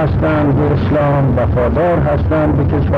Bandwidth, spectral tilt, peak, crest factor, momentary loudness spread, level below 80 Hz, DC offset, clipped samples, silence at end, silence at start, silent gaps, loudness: 5.2 kHz; -10.5 dB/octave; -4 dBFS; 8 dB; 1 LU; -24 dBFS; under 0.1%; under 0.1%; 0 s; 0 s; none; -14 LUFS